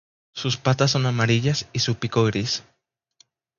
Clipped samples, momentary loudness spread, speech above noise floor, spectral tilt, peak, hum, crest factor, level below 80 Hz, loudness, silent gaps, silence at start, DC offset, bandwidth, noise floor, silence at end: under 0.1%; 8 LU; 39 dB; -5 dB/octave; -6 dBFS; none; 18 dB; -54 dBFS; -22 LUFS; none; 0.35 s; under 0.1%; 7.4 kHz; -61 dBFS; 0.95 s